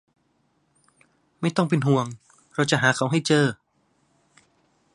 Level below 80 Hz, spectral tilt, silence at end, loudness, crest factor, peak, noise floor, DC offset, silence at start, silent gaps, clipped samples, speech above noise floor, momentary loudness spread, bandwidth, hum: -68 dBFS; -5 dB/octave; 1.4 s; -23 LUFS; 22 dB; -4 dBFS; -68 dBFS; under 0.1%; 1.4 s; none; under 0.1%; 46 dB; 14 LU; 11.5 kHz; none